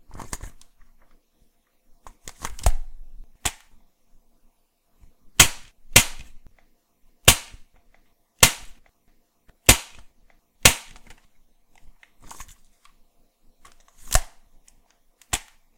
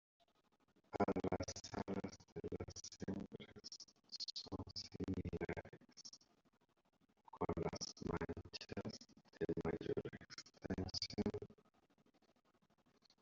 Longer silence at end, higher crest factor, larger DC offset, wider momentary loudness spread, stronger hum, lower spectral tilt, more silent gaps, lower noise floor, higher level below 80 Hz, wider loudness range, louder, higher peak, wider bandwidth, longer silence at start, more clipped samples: second, 0.4 s vs 1.7 s; about the same, 26 dB vs 24 dB; neither; first, 27 LU vs 14 LU; neither; second, -1.5 dB/octave vs -5 dB/octave; second, none vs 2.32-2.36 s; second, -65 dBFS vs -79 dBFS; first, -34 dBFS vs -66 dBFS; first, 13 LU vs 3 LU; first, -19 LUFS vs -47 LUFS; first, 0 dBFS vs -24 dBFS; first, 17 kHz vs 7.6 kHz; second, 0.1 s vs 0.9 s; neither